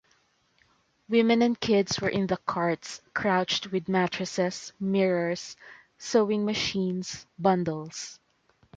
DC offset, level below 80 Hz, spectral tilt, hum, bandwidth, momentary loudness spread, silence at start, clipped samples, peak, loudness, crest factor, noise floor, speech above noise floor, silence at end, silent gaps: under 0.1%; -62 dBFS; -5 dB/octave; none; 9 kHz; 12 LU; 1.1 s; under 0.1%; -8 dBFS; -27 LUFS; 18 dB; -67 dBFS; 41 dB; 0.65 s; none